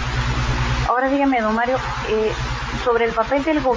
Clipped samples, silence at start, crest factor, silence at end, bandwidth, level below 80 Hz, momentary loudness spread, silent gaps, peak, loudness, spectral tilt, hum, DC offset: under 0.1%; 0 s; 16 dB; 0 s; 7.6 kHz; -30 dBFS; 5 LU; none; -4 dBFS; -20 LUFS; -6 dB/octave; none; under 0.1%